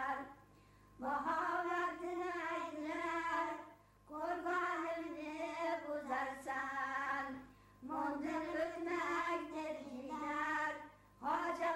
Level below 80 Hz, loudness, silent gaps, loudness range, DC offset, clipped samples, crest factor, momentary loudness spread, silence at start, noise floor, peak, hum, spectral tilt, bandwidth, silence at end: -72 dBFS; -41 LUFS; none; 1 LU; under 0.1%; under 0.1%; 14 dB; 9 LU; 0 s; -65 dBFS; -26 dBFS; none; -4 dB/octave; 15.5 kHz; 0 s